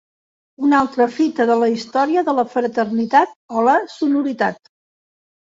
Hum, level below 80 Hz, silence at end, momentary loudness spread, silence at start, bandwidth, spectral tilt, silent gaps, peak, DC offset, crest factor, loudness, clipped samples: none; -64 dBFS; 0.95 s; 5 LU; 0.6 s; 7.8 kHz; -5.5 dB/octave; 3.36-3.49 s; -2 dBFS; under 0.1%; 18 dB; -18 LUFS; under 0.1%